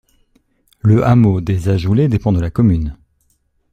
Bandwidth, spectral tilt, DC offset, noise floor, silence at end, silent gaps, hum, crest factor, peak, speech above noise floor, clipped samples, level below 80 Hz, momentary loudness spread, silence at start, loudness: 9.2 kHz; -9.5 dB/octave; under 0.1%; -61 dBFS; 0.8 s; none; none; 14 dB; -2 dBFS; 49 dB; under 0.1%; -34 dBFS; 7 LU; 0.85 s; -14 LUFS